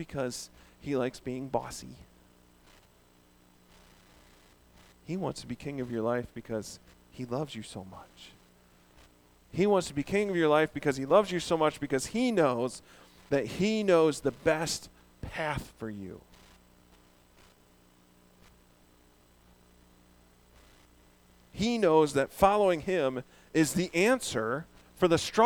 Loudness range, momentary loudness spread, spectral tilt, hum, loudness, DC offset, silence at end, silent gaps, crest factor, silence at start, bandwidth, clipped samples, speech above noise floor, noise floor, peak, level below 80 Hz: 15 LU; 19 LU; -5 dB/octave; 60 Hz at -60 dBFS; -29 LUFS; under 0.1%; 0 s; none; 26 dB; 0 s; over 20 kHz; under 0.1%; 33 dB; -62 dBFS; -6 dBFS; -58 dBFS